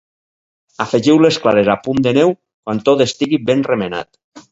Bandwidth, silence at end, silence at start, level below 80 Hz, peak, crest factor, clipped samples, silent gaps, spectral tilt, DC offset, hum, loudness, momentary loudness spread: 8 kHz; 0.1 s; 0.8 s; -52 dBFS; 0 dBFS; 16 dB; under 0.1%; 2.54-2.63 s, 4.24-4.32 s; -5.5 dB/octave; under 0.1%; none; -15 LUFS; 12 LU